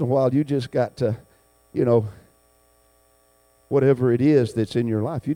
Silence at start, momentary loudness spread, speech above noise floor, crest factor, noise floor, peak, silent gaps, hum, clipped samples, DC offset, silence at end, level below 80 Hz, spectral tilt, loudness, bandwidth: 0 s; 8 LU; 39 dB; 16 dB; -60 dBFS; -6 dBFS; none; 60 Hz at -45 dBFS; under 0.1%; under 0.1%; 0 s; -58 dBFS; -8.5 dB/octave; -21 LUFS; 16.5 kHz